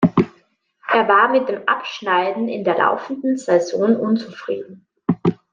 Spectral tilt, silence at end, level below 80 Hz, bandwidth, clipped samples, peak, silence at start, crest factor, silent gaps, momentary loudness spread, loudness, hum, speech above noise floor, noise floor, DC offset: -6.5 dB/octave; 0.2 s; -58 dBFS; 9.4 kHz; under 0.1%; -2 dBFS; 0 s; 16 dB; none; 13 LU; -19 LUFS; none; 40 dB; -59 dBFS; under 0.1%